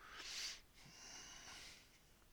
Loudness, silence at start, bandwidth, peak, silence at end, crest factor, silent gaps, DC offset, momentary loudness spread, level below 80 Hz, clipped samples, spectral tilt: -52 LUFS; 0 s; over 20 kHz; -36 dBFS; 0 s; 20 dB; none; under 0.1%; 17 LU; -72 dBFS; under 0.1%; 0 dB/octave